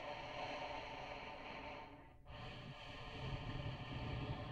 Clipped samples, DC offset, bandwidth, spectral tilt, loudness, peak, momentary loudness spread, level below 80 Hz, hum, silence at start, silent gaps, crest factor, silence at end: under 0.1%; under 0.1%; 10 kHz; -6 dB/octave; -49 LUFS; -32 dBFS; 8 LU; -58 dBFS; none; 0 s; none; 16 dB; 0 s